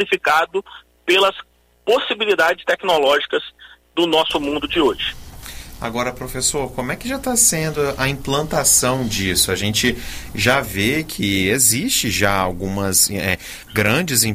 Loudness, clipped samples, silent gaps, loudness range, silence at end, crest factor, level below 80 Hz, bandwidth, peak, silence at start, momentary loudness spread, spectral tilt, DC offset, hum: -17 LUFS; under 0.1%; none; 4 LU; 0 s; 16 dB; -40 dBFS; 16 kHz; -2 dBFS; 0 s; 12 LU; -2.5 dB/octave; under 0.1%; none